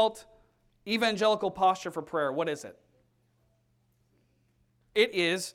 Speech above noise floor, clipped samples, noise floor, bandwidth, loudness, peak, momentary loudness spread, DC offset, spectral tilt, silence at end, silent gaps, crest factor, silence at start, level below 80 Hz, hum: 42 dB; under 0.1%; -71 dBFS; 16.5 kHz; -28 LUFS; -10 dBFS; 10 LU; under 0.1%; -3.5 dB/octave; 0.05 s; none; 20 dB; 0 s; -70 dBFS; none